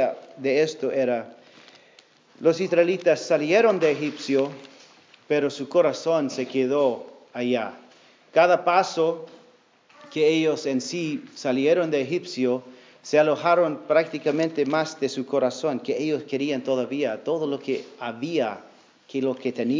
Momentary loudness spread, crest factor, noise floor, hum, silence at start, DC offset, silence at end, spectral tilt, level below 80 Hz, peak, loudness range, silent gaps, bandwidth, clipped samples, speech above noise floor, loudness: 10 LU; 20 dB; -57 dBFS; none; 0 s; under 0.1%; 0 s; -5 dB/octave; -84 dBFS; -4 dBFS; 3 LU; none; 7.6 kHz; under 0.1%; 34 dB; -24 LUFS